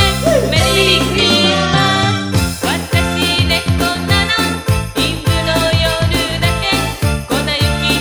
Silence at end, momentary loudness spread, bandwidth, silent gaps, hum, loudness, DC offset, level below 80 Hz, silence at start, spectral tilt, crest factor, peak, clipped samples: 0 s; 6 LU; over 20 kHz; none; none; -13 LUFS; under 0.1%; -26 dBFS; 0 s; -4 dB/octave; 14 dB; 0 dBFS; under 0.1%